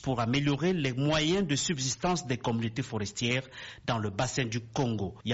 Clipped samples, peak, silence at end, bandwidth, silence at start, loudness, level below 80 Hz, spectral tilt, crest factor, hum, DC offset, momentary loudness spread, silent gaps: under 0.1%; -14 dBFS; 0 s; 8 kHz; 0 s; -30 LUFS; -54 dBFS; -4.5 dB/octave; 16 dB; none; under 0.1%; 6 LU; none